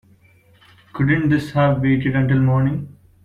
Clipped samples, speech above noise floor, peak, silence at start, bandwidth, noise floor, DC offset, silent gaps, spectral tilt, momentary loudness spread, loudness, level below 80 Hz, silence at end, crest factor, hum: under 0.1%; 36 dB; -6 dBFS; 0.95 s; 6.8 kHz; -53 dBFS; under 0.1%; none; -9 dB/octave; 11 LU; -18 LUFS; -44 dBFS; 0.3 s; 14 dB; none